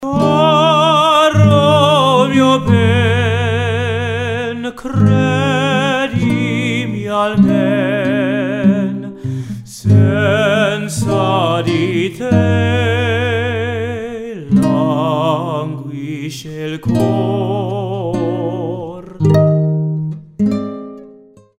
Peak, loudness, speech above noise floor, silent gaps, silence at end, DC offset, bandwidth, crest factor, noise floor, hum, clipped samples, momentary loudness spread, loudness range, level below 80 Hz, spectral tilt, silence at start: 0 dBFS; -14 LUFS; 28 dB; none; 0.5 s; under 0.1%; 13.5 kHz; 14 dB; -42 dBFS; none; under 0.1%; 13 LU; 6 LU; -46 dBFS; -6.5 dB/octave; 0 s